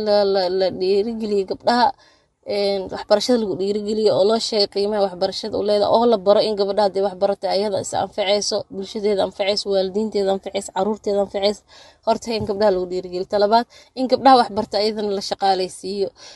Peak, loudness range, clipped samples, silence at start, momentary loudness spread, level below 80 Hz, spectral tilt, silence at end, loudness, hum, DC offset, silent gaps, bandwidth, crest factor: 0 dBFS; 3 LU; under 0.1%; 0 s; 9 LU; -54 dBFS; -4.5 dB/octave; 0 s; -20 LUFS; none; under 0.1%; none; 12 kHz; 18 dB